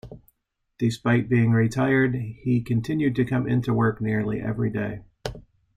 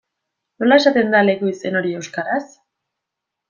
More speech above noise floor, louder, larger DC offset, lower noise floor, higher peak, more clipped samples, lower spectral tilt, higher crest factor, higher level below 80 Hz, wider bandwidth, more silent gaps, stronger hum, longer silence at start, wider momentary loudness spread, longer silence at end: second, 52 dB vs 65 dB; second, -24 LUFS vs -17 LUFS; neither; second, -74 dBFS vs -82 dBFS; second, -8 dBFS vs -2 dBFS; neither; first, -8 dB/octave vs -5 dB/octave; about the same, 16 dB vs 18 dB; first, -50 dBFS vs -66 dBFS; first, 10 kHz vs 7.4 kHz; neither; neither; second, 0.05 s vs 0.6 s; about the same, 10 LU vs 11 LU; second, 0.35 s vs 1.05 s